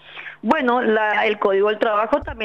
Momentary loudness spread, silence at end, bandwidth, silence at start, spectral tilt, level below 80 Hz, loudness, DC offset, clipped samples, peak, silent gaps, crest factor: 5 LU; 0 s; 7.4 kHz; 0.1 s; -6 dB/octave; -46 dBFS; -19 LUFS; 0.1%; under 0.1%; -6 dBFS; none; 14 dB